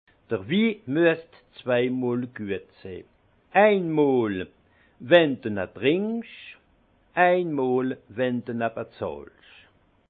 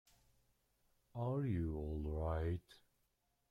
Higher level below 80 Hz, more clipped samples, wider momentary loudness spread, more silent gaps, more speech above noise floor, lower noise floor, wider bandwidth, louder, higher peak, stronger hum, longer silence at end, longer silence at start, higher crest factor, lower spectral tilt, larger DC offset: second, -66 dBFS vs -54 dBFS; neither; first, 21 LU vs 7 LU; neither; second, 38 dB vs 42 dB; second, -62 dBFS vs -82 dBFS; second, 4.6 kHz vs 5.4 kHz; first, -24 LUFS vs -42 LUFS; first, -4 dBFS vs -30 dBFS; neither; about the same, 0.85 s vs 0.75 s; second, 0.3 s vs 1.15 s; first, 22 dB vs 14 dB; about the same, -9.5 dB/octave vs -9.5 dB/octave; neither